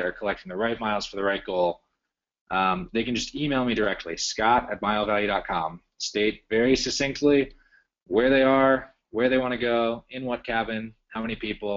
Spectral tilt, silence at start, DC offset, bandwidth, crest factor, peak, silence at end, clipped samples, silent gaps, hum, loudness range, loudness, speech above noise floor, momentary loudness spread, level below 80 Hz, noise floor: -3 dB/octave; 0 s; under 0.1%; 7.6 kHz; 16 dB; -8 dBFS; 0 s; under 0.1%; 2.41-2.46 s; none; 4 LU; -25 LUFS; 58 dB; 10 LU; -50 dBFS; -82 dBFS